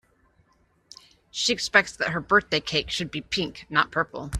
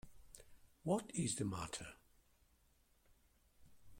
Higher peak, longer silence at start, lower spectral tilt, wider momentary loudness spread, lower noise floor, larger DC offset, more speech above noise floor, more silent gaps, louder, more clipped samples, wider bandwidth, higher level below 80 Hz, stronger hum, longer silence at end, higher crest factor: first, -2 dBFS vs -24 dBFS; first, 1.35 s vs 0.05 s; second, -3 dB/octave vs -4.5 dB/octave; second, 8 LU vs 22 LU; second, -65 dBFS vs -74 dBFS; neither; first, 40 dB vs 33 dB; neither; first, -24 LUFS vs -42 LUFS; neither; second, 14 kHz vs 16.5 kHz; first, -46 dBFS vs -68 dBFS; neither; about the same, 0 s vs 0 s; about the same, 24 dB vs 22 dB